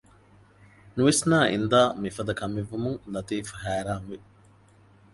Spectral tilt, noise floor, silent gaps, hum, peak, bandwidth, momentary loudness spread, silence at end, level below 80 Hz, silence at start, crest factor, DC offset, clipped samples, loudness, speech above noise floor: -4.5 dB/octave; -56 dBFS; none; none; -6 dBFS; 11.5 kHz; 13 LU; 0.95 s; -54 dBFS; 0.85 s; 22 dB; under 0.1%; under 0.1%; -26 LUFS; 31 dB